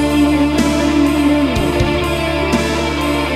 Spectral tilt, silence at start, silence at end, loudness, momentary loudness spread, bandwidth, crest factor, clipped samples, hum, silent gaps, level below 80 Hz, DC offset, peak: -5.5 dB/octave; 0 s; 0 s; -15 LUFS; 4 LU; 15 kHz; 12 dB; under 0.1%; none; none; -26 dBFS; under 0.1%; -2 dBFS